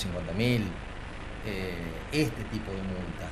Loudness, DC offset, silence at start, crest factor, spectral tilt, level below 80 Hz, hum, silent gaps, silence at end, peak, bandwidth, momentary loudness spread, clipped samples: -33 LUFS; under 0.1%; 0 s; 18 dB; -6 dB/octave; -42 dBFS; none; none; 0 s; -14 dBFS; 14 kHz; 13 LU; under 0.1%